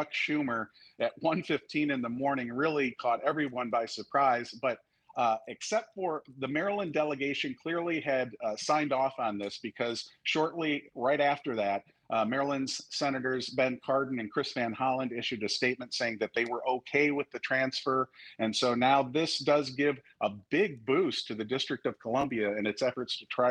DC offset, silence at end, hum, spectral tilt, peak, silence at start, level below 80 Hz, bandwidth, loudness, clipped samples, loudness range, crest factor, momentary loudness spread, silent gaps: under 0.1%; 0 s; none; -4.5 dB/octave; -12 dBFS; 0 s; -74 dBFS; 10.5 kHz; -31 LUFS; under 0.1%; 3 LU; 18 dB; 7 LU; none